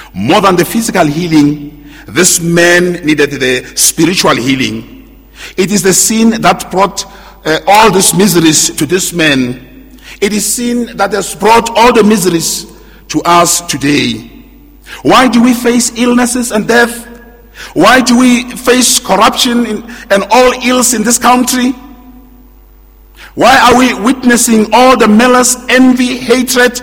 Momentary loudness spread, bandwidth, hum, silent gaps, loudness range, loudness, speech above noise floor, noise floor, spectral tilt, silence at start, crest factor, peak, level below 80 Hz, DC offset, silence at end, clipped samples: 10 LU; over 20 kHz; none; none; 3 LU; -8 LUFS; 30 dB; -38 dBFS; -3 dB/octave; 0 s; 8 dB; 0 dBFS; -36 dBFS; under 0.1%; 0 s; 2%